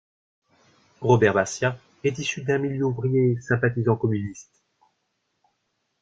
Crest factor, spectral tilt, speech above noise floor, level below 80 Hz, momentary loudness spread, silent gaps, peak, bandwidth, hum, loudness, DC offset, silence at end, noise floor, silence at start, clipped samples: 22 dB; -6 dB/octave; 52 dB; -60 dBFS; 10 LU; none; -4 dBFS; 8.8 kHz; none; -23 LUFS; under 0.1%; 1.6 s; -75 dBFS; 1 s; under 0.1%